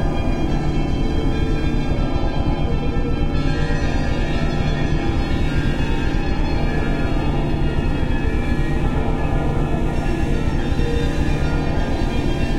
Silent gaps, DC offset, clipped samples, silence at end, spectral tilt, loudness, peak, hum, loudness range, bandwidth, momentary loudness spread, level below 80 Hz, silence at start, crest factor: none; under 0.1%; under 0.1%; 0 s; -7 dB/octave; -22 LUFS; -6 dBFS; none; 0 LU; 9.4 kHz; 1 LU; -22 dBFS; 0 s; 12 dB